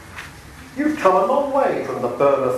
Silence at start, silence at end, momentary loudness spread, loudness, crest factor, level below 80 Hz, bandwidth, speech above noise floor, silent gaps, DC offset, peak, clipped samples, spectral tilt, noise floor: 0 s; 0 s; 19 LU; -19 LUFS; 20 dB; -50 dBFS; 13.5 kHz; 21 dB; none; under 0.1%; 0 dBFS; under 0.1%; -6 dB/octave; -39 dBFS